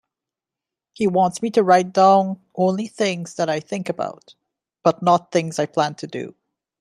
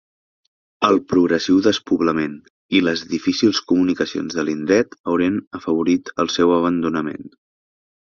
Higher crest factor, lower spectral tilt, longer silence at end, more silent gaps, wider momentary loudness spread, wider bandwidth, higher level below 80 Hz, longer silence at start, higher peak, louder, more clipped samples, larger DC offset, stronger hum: about the same, 20 dB vs 18 dB; about the same, -5.5 dB/octave vs -5 dB/octave; second, 0.5 s vs 0.9 s; second, none vs 2.50-2.69 s, 5.00-5.04 s, 5.47-5.51 s; first, 13 LU vs 7 LU; first, 12.5 kHz vs 7.2 kHz; second, -68 dBFS vs -54 dBFS; first, 1 s vs 0.8 s; about the same, -2 dBFS vs -2 dBFS; about the same, -20 LUFS vs -19 LUFS; neither; neither; neither